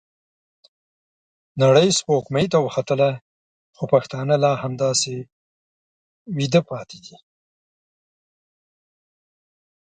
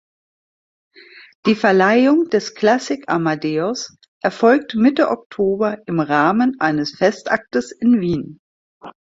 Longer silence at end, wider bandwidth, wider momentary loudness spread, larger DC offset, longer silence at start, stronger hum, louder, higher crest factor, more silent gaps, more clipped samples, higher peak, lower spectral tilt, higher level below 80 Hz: first, 2.8 s vs 0.3 s; first, 9.6 kHz vs 7.8 kHz; first, 17 LU vs 9 LU; neither; about the same, 1.55 s vs 1.45 s; neither; second, -20 LUFS vs -17 LUFS; about the same, 20 dB vs 16 dB; first, 3.21-3.73 s, 5.32-6.25 s vs 4.08-4.21 s, 5.26-5.30 s, 8.39-8.81 s; neither; about the same, -2 dBFS vs -2 dBFS; about the same, -5 dB/octave vs -5.5 dB/octave; second, -64 dBFS vs -56 dBFS